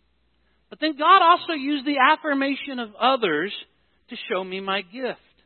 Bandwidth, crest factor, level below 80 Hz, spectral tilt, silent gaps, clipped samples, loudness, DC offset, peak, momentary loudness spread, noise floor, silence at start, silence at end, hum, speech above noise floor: 4.5 kHz; 20 dB; -74 dBFS; -8.5 dB/octave; none; under 0.1%; -21 LUFS; under 0.1%; -2 dBFS; 16 LU; -67 dBFS; 0.8 s; 0.3 s; none; 45 dB